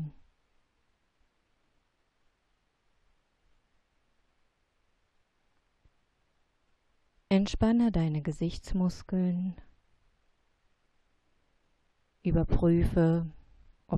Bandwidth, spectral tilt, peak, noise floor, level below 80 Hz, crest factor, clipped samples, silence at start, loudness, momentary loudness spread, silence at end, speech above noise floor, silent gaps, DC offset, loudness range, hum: 10.5 kHz; -8 dB/octave; -12 dBFS; -75 dBFS; -44 dBFS; 20 dB; under 0.1%; 0 s; -29 LUFS; 10 LU; 0 s; 47 dB; none; under 0.1%; 8 LU; none